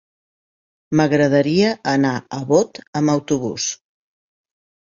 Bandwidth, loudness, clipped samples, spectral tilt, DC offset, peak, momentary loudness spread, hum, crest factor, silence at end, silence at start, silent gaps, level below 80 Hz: 7.6 kHz; -18 LUFS; under 0.1%; -5 dB/octave; under 0.1%; -2 dBFS; 9 LU; none; 18 dB; 1.1 s; 0.9 s; 2.87-2.93 s; -58 dBFS